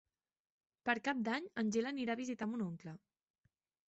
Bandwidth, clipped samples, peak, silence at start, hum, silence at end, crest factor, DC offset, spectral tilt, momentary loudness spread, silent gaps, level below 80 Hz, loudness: 8 kHz; under 0.1%; -20 dBFS; 0.85 s; none; 0.9 s; 22 dB; under 0.1%; -4 dB/octave; 12 LU; none; -82 dBFS; -39 LUFS